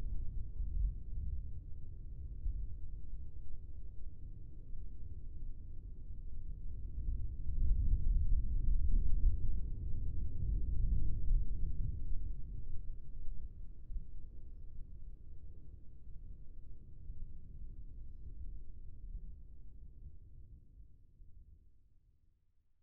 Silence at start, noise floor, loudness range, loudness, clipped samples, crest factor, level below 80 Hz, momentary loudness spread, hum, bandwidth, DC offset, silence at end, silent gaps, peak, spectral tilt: 0 s; -70 dBFS; 17 LU; -44 LUFS; under 0.1%; 16 dB; -38 dBFS; 20 LU; none; 0.6 kHz; under 0.1%; 1.3 s; none; -18 dBFS; -16.5 dB/octave